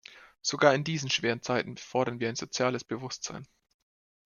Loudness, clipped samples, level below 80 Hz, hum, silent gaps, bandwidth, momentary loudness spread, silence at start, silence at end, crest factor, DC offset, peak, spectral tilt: -30 LUFS; under 0.1%; -70 dBFS; none; none; 10 kHz; 12 LU; 0.1 s; 0.8 s; 24 dB; under 0.1%; -6 dBFS; -4 dB/octave